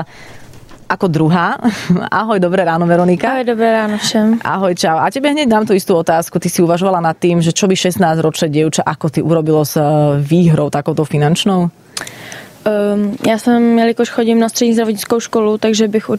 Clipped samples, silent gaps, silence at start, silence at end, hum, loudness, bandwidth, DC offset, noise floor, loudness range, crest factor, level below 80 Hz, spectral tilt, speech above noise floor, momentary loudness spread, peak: under 0.1%; none; 0 s; 0 s; none; -13 LUFS; 15.5 kHz; under 0.1%; -36 dBFS; 1 LU; 12 dB; -50 dBFS; -5.5 dB/octave; 23 dB; 5 LU; -2 dBFS